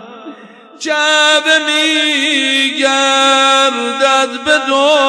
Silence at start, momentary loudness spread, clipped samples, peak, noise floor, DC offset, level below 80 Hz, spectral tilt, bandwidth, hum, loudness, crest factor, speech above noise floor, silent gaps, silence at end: 0 s; 5 LU; under 0.1%; -2 dBFS; -36 dBFS; under 0.1%; -64 dBFS; 0.5 dB/octave; 11 kHz; none; -10 LUFS; 12 dB; 24 dB; none; 0 s